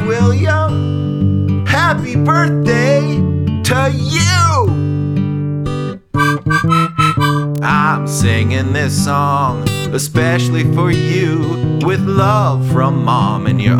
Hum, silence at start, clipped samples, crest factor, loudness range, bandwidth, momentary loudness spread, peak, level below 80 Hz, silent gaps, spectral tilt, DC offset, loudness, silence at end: none; 0 s; under 0.1%; 12 dB; 1 LU; 16 kHz; 5 LU; -2 dBFS; -38 dBFS; none; -6 dB/octave; under 0.1%; -14 LUFS; 0 s